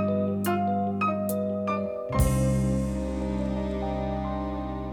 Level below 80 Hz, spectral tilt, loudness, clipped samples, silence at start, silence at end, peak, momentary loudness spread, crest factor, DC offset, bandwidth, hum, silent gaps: -36 dBFS; -7 dB/octave; -28 LUFS; under 0.1%; 0 s; 0 s; -10 dBFS; 6 LU; 16 dB; under 0.1%; 18.5 kHz; none; none